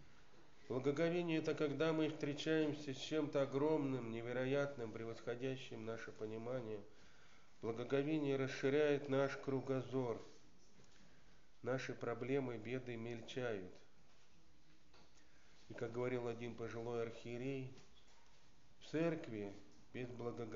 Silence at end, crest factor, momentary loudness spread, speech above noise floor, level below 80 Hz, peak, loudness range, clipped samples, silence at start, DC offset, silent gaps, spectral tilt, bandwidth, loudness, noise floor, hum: 0 s; 18 dB; 11 LU; 30 dB; -76 dBFS; -24 dBFS; 8 LU; under 0.1%; 0 s; 0.2%; none; -5.5 dB/octave; 7.4 kHz; -42 LUFS; -72 dBFS; none